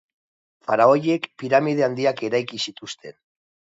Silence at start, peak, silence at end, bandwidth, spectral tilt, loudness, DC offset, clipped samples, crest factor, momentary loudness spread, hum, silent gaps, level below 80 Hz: 0.7 s; -2 dBFS; 0.65 s; 8 kHz; -5.5 dB/octave; -21 LUFS; under 0.1%; under 0.1%; 20 dB; 18 LU; none; none; -72 dBFS